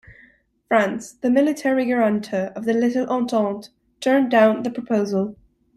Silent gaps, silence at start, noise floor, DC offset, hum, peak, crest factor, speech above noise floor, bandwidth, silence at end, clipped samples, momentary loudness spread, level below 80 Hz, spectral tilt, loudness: none; 0.1 s; -56 dBFS; under 0.1%; none; -4 dBFS; 16 dB; 36 dB; 13 kHz; 0.4 s; under 0.1%; 9 LU; -62 dBFS; -6 dB/octave; -21 LUFS